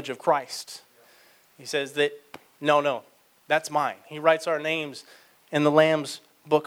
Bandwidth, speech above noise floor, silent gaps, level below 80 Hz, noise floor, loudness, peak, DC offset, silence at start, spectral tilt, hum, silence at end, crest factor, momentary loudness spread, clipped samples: 17.5 kHz; 32 dB; none; -78 dBFS; -57 dBFS; -25 LUFS; -6 dBFS; under 0.1%; 0 s; -4.5 dB/octave; none; 0 s; 22 dB; 18 LU; under 0.1%